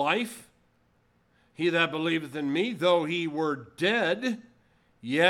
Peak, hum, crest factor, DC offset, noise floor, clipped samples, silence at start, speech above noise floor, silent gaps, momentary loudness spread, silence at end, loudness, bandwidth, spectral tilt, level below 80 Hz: -6 dBFS; none; 22 dB; under 0.1%; -67 dBFS; under 0.1%; 0 s; 40 dB; none; 10 LU; 0 s; -27 LUFS; 15.5 kHz; -5 dB/octave; -74 dBFS